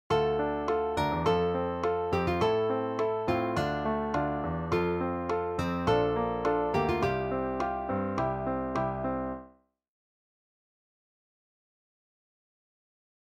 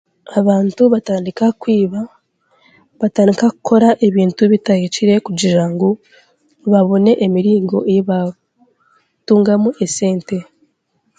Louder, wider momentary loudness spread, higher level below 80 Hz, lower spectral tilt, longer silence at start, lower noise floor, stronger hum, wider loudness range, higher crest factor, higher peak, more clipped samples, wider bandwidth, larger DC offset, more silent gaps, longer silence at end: second, -30 LUFS vs -14 LUFS; second, 4 LU vs 9 LU; first, -50 dBFS vs -60 dBFS; about the same, -7 dB/octave vs -6.5 dB/octave; second, 0.1 s vs 0.3 s; second, -58 dBFS vs -64 dBFS; neither; first, 8 LU vs 3 LU; about the same, 18 dB vs 14 dB; second, -12 dBFS vs 0 dBFS; neither; first, 14.5 kHz vs 9.4 kHz; neither; neither; first, 3.8 s vs 0.75 s